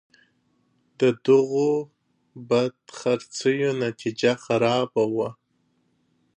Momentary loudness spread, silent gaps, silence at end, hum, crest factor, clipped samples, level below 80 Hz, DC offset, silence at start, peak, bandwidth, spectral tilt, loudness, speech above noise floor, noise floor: 9 LU; none; 1.05 s; none; 18 dB; under 0.1%; -72 dBFS; under 0.1%; 1 s; -8 dBFS; 10 kHz; -5.5 dB/octave; -23 LUFS; 46 dB; -69 dBFS